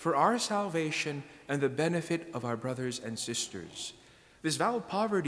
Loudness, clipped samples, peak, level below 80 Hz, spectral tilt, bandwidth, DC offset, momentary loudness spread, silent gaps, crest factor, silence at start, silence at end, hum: -32 LUFS; under 0.1%; -12 dBFS; -70 dBFS; -4 dB/octave; 11 kHz; under 0.1%; 11 LU; none; 20 dB; 0 s; 0 s; none